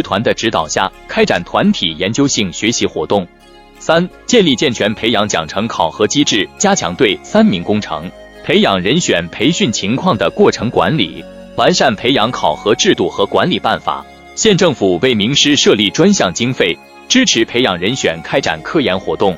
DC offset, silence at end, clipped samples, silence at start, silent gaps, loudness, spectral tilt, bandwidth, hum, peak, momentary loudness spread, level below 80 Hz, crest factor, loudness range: under 0.1%; 0 s; 0.2%; 0 s; none; -13 LUFS; -4 dB/octave; 13 kHz; none; 0 dBFS; 7 LU; -44 dBFS; 14 dB; 3 LU